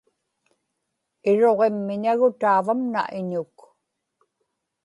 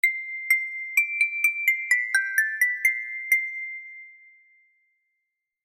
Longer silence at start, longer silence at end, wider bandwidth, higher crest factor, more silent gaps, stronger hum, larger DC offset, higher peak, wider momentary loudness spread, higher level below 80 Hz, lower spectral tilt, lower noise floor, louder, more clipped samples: first, 1.25 s vs 0.05 s; about the same, 1.4 s vs 1.5 s; second, 11 kHz vs 16.5 kHz; about the same, 16 dB vs 18 dB; neither; neither; neither; about the same, -8 dBFS vs -8 dBFS; about the same, 11 LU vs 12 LU; first, -76 dBFS vs under -90 dBFS; first, -7.5 dB/octave vs 7 dB/octave; about the same, -78 dBFS vs -81 dBFS; about the same, -22 LUFS vs -23 LUFS; neither